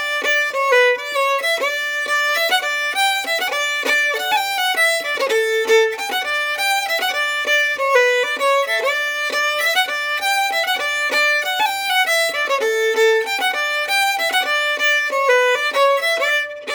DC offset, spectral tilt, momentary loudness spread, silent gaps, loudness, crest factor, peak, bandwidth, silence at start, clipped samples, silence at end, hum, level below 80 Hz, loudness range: under 0.1%; 1.5 dB/octave; 4 LU; none; -17 LUFS; 16 dB; -2 dBFS; over 20 kHz; 0 s; under 0.1%; 0 s; none; -70 dBFS; 1 LU